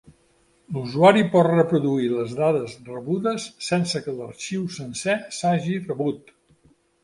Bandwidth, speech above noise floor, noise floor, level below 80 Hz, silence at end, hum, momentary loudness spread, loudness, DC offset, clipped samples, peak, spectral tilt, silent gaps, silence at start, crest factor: 11.5 kHz; 39 dB; -62 dBFS; -62 dBFS; 0.85 s; none; 15 LU; -22 LUFS; under 0.1%; under 0.1%; -2 dBFS; -6 dB/octave; none; 0.7 s; 20 dB